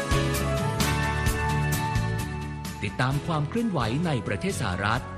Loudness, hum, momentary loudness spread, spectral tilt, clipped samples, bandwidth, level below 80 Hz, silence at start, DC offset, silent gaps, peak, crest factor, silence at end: -27 LUFS; none; 6 LU; -5 dB/octave; under 0.1%; 14.5 kHz; -36 dBFS; 0 s; under 0.1%; none; -10 dBFS; 16 dB; 0 s